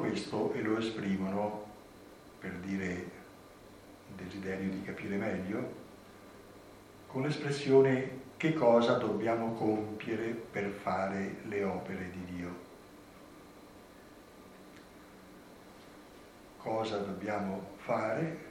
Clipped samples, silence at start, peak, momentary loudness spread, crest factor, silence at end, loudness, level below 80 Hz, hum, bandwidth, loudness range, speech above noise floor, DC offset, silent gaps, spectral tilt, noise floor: under 0.1%; 0 s; -12 dBFS; 24 LU; 22 dB; 0 s; -34 LUFS; -68 dBFS; none; 16 kHz; 19 LU; 21 dB; under 0.1%; none; -6.5 dB/octave; -55 dBFS